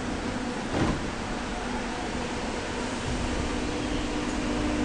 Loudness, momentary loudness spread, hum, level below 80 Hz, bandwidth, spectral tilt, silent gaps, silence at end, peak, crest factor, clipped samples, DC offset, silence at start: -30 LUFS; 4 LU; none; -38 dBFS; 10 kHz; -5 dB/octave; none; 0 s; -14 dBFS; 16 dB; under 0.1%; under 0.1%; 0 s